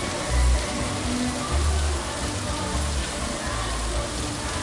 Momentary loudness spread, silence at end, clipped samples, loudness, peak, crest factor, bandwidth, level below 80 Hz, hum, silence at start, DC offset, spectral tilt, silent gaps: 4 LU; 0 s; under 0.1%; -26 LUFS; -10 dBFS; 14 dB; 11.5 kHz; -28 dBFS; none; 0 s; under 0.1%; -4 dB/octave; none